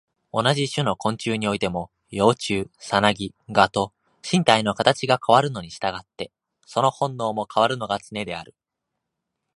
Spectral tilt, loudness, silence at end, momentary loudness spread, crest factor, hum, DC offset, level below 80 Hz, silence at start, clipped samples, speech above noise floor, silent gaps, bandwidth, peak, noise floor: -4.5 dB/octave; -22 LUFS; 1.15 s; 13 LU; 24 dB; none; under 0.1%; -56 dBFS; 0.35 s; under 0.1%; 60 dB; none; 11.5 kHz; 0 dBFS; -82 dBFS